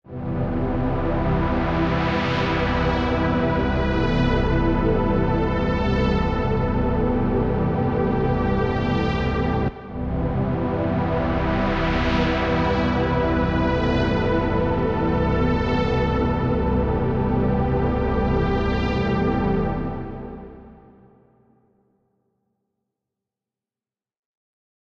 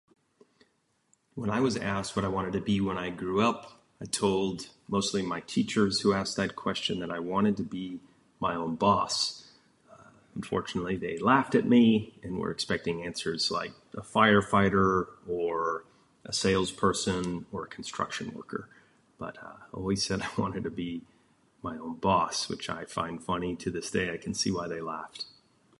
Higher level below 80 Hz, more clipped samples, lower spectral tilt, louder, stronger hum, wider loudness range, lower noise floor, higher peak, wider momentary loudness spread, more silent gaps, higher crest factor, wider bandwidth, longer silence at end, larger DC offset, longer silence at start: first, -30 dBFS vs -56 dBFS; neither; first, -8.5 dB/octave vs -4.5 dB/octave; first, -22 LUFS vs -29 LUFS; neither; second, 3 LU vs 7 LU; first, under -90 dBFS vs -72 dBFS; about the same, -8 dBFS vs -6 dBFS; second, 3 LU vs 16 LU; neither; second, 14 dB vs 24 dB; second, 7.2 kHz vs 11.5 kHz; first, 4.1 s vs 0.55 s; neither; second, 0.05 s vs 1.35 s